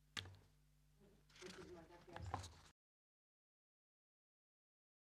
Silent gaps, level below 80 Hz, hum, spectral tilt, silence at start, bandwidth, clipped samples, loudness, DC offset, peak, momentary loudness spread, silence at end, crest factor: none; -74 dBFS; none; -4 dB/octave; 0 s; 14.5 kHz; under 0.1%; -55 LUFS; under 0.1%; -28 dBFS; 16 LU; 2.4 s; 30 dB